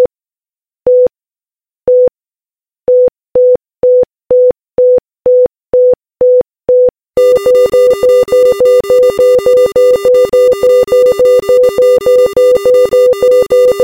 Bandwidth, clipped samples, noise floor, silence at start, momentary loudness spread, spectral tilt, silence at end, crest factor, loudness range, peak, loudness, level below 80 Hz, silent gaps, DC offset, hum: 16 kHz; under 0.1%; under -90 dBFS; 0 s; 4 LU; -4.5 dB/octave; 0 s; 8 dB; 4 LU; 0 dBFS; -8 LUFS; -44 dBFS; none; under 0.1%; none